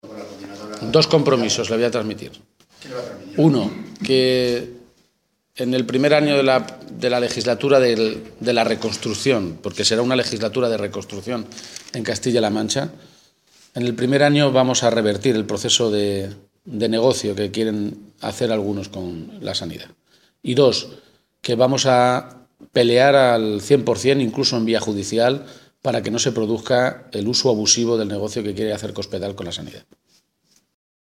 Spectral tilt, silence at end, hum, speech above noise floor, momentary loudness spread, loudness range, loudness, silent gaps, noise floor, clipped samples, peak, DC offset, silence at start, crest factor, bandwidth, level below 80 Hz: -4.5 dB/octave; 1.3 s; none; 49 dB; 15 LU; 6 LU; -19 LUFS; none; -68 dBFS; under 0.1%; -2 dBFS; under 0.1%; 0.05 s; 20 dB; 15.5 kHz; -60 dBFS